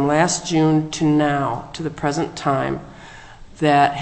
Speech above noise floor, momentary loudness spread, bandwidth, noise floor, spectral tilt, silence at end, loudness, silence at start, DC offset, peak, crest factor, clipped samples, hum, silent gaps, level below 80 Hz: 21 dB; 13 LU; 8.6 kHz; -40 dBFS; -5 dB/octave; 0 s; -19 LUFS; 0 s; under 0.1%; -2 dBFS; 16 dB; under 0.1%; none; none; -46 dBFS